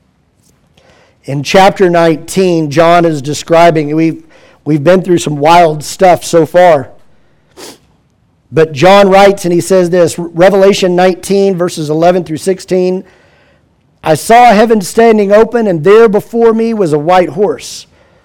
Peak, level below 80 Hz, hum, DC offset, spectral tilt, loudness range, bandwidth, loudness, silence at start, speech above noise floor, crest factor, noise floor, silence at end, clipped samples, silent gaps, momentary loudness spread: 0 dBFS; -42 dBFS; none; under 0.1%; -5.5 dB/octave; 3 LU; 17.5 kHz; -8 LUFS; 1.3 s; 44 dB; 8 dB; -52 dBFS; 0.45 s; 1%; none; 10 LU